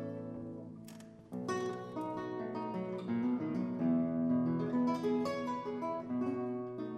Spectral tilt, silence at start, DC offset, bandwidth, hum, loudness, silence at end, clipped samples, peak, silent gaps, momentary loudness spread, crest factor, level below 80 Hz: -7.5 dB/octave; 0 s; under 0.1%; 11 kHz; none; -37 LUFS; 0 s; under 0.1%; -24 dBFS; none; 13 LU; 14 dB; -72 dBFS